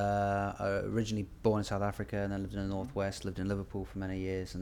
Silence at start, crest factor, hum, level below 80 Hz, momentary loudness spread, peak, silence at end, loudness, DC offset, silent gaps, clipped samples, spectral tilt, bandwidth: 0 s; 18 dB; none; -50 dBFS; 6 LU; -16 dBFS; 0 s; -35 LUFS; under 0.1%; none; under 0.1%; -6.5 dB/octave; 14.5 kHz